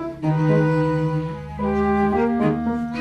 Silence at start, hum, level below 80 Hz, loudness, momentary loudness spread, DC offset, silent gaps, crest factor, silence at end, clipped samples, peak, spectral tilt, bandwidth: 0 s; none; -40 dBFS; -21 LUFS; 7 LU; under 0.1%; none; 14 dB; 0 s; under 0.1%; -6 dBFS; -9 dB/octave; 6.4 kHz